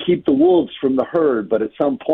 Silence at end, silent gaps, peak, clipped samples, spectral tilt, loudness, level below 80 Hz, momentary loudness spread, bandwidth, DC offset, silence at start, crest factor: 0 s; none; -4 dBFS; under 0.1%; -9.5 dB/octave; -17 LUFS; -56 dBFS; 6 LU; 4 kHz; under 0.1%; 0 s; 12 dB